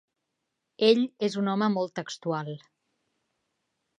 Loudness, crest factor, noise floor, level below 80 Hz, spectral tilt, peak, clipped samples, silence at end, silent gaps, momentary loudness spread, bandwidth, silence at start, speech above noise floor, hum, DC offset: -27 LUFS; 22 dB; -82 dBFS; -84 dBFS; -6 dB/octave; -8 dBFS; under 0.1%; 1.4 s; none; 12 LU; 9.8 kHz; 0.8 s; 56 dB; none; under 0.1%